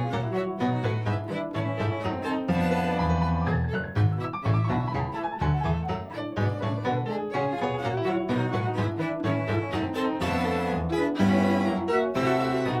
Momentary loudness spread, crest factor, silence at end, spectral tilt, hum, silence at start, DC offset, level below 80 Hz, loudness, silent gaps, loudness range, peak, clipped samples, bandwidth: 5 LU; 16 dB; 0 s; -7.5 dB/octave; none; 0 s; under 0.1%; -44 dBFS; -27 LUFS; none; 3 LU; -10 dBFS; under 0.1%; 13 kHz